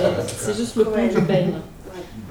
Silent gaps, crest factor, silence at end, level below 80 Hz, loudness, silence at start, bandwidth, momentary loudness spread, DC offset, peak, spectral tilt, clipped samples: none; 18 dB; 0 s; -44 dBFS; -21 LUFS; 0 s; 19 kHz; 18 LU; under 0.1%; -4 dBFS; -6 dB/octave; under 0.1%